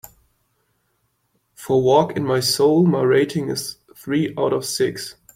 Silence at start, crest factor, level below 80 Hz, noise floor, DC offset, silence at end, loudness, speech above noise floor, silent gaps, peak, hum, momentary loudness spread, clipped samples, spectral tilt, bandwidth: 1.6 s; 18 dB; -58 dBFS; -68 dBFS; under 0.1%; 0.25 s; -19 LUFS; 50 dB; none; -2 dBFS; none; 13 LU; under 0.1%; -5 dB/octave; 16.5 kHz